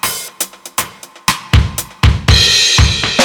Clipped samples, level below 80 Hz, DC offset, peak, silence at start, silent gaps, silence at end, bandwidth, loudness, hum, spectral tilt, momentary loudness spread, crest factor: under 0.1%; -20 dBFS; under 0.1%; 0 dBFS; 0.05 s; none; 0 s; 20 kHz; -12 LUFS; none; -3 dB/octave; 13 LU; 12 dB